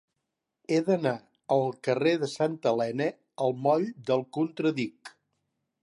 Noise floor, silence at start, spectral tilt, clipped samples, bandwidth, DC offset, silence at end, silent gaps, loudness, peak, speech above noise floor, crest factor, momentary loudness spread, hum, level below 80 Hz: -84 dBFS; 0.7 s; -6.5 dB/octave; under 0.1%; 11.5 kHz; under 0.1%; 0.75 s; none; -28 LUFS; -12 dBFS; 57 dB; 18 dB; 6 LU; none; -78 dBFS